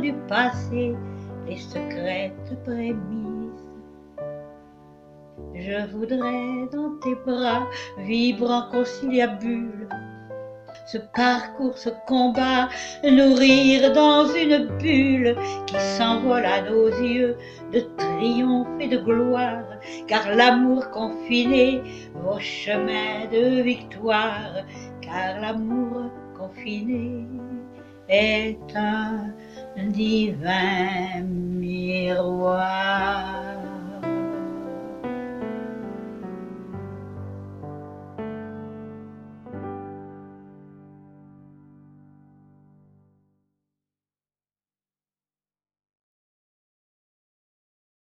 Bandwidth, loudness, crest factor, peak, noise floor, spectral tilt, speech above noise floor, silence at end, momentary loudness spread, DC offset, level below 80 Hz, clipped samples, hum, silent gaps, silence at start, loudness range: 7.8 kHz; -23 LUFS; 22 dB; -2 dBFS; under -90 dBFS; -5.5 dB/octave; over 68 dB; 7.1 s; 19 LU; under 0.1%; -54 dBFS; under 0.1%; none; none; 0 s; 18 LU